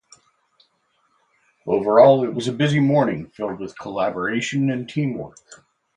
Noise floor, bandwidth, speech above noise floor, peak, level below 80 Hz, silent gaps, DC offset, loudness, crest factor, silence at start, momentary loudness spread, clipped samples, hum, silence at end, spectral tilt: -66 dBFS; 10.5 kHz; 47 dB; 0 dBFS; -60 dBFS; none; under 0.1%; -20 LUFS; 20 dB; 1.65 s; 17 LU; under 0.1%; none; 0.4 s; -6.5 dB/octave